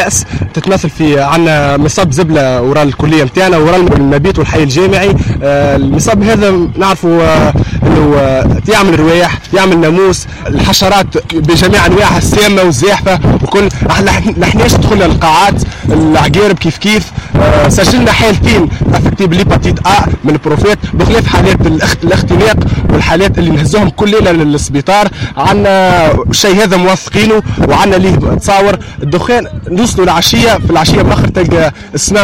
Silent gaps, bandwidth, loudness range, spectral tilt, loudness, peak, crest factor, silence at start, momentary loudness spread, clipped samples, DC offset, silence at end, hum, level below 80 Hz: none; 16.5 kHz; 1 LU; -5 dB/octave; -8 LUFS; 0 dBFS; 8 dB; 0 s; 4 LU; under 0.1%; 1%; 0 s; none; -20 dBFS